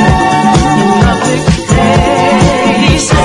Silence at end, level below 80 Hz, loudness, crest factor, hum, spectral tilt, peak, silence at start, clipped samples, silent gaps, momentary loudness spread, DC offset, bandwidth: 0 s; -20 dBFS; -8 LUFS; 8 dB; none; -5 dB/octave; 0 dBFS; 0 s; 0.5%; none; 2 LU; under 0.1%; 11.5 kHz